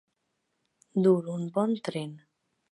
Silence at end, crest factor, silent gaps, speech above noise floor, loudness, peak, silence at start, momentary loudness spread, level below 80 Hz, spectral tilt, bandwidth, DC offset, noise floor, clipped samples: 0.55 s; 18 dB; none; 52 dB; -28 LUFS; -12 dBFS; 0.95 s; 12 LU; -80 dBFS; -8 dB/octave; 11.5 kHz; under 0.1%; -79 dBFS; under 0.1%